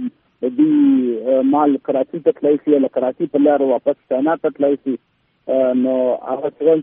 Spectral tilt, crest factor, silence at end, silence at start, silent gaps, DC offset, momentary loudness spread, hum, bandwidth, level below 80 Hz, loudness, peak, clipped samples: -6.5 dB/octave; 14 dB; 0 s; 0 s; none; under 0.1%; 9 LU; none; 3.7 kHz; -68 dBFS; -17 LUFS; -2 dBFS; under 0.1%